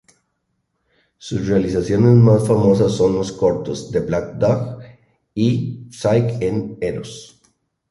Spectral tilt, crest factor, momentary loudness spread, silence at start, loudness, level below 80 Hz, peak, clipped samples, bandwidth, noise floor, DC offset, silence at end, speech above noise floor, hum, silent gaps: -7.5 dB/octave; 16 dB; 17 LU; 1.25 s; -18 LUFS; -44 dBFS; -2 dBFS; under 0.1%; 11.5 kHz; -71 dBFS; under 0.1%; 0.65 s; 54 dB; none; none